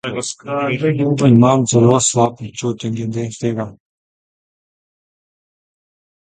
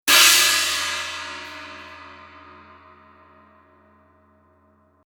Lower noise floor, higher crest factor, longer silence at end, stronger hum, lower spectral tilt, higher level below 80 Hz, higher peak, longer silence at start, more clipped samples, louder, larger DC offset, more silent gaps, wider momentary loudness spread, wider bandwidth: first, under -90 dBFS vs -59 dBFS; second, 18 dB vs 24 dB; second, 2.55 s vs 2.9 s; neither; first, -5.5 dB/octave vs 2 dB/octave; first, -52 dBFS vs -62 dBFS; about the same, 0 dBFS vs 0 dBFS; about the same, 0.05 s vs 0.05 s; neither; about the same, -16 LUFS vs -16 LUFS; neither; neither; second, 12 LU vs 28 LU; second, 9.6 kHz vs over 20 kHz